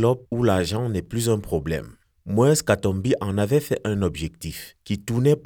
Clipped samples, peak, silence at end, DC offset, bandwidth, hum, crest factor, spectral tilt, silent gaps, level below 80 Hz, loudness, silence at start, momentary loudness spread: under 0.1%; -4 dBFS; 0.05 s; under 0.1%; 19.5 kHz; none; 18 dB; -6 dB/octave; none; -46 dBFS; -23 LUFS; 0 s; 12 LU